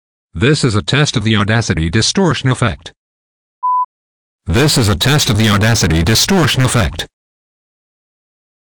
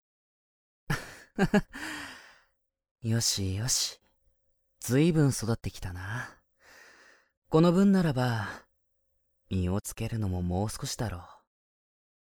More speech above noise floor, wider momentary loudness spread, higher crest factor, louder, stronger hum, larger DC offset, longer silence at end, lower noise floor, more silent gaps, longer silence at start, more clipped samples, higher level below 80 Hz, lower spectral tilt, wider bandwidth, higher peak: first, over 78 dB vs 47 dB; second, 10 LU vs 16 LU; second, 14 dB vs 20 dB; first, -13 LUFS vs -29 LUFS; neither; neither; first, 1.55 s vs 1 s; first, under -90 dBFS vs -75 dBFS; first, 2.96-3.62 s, 3.85-4.39 s vs 2.91-2.95 s, 7.37-7.42 s; second, 0.35 s vs 0.9 s; neither; first, -32 dBFS vs -50 dBFS; about the same, -4.5 dB/octave vs -5 dB/octave; about the same, over 20 kHz vs over 20 kHz; first, -2 dBFS vs -10 dBFS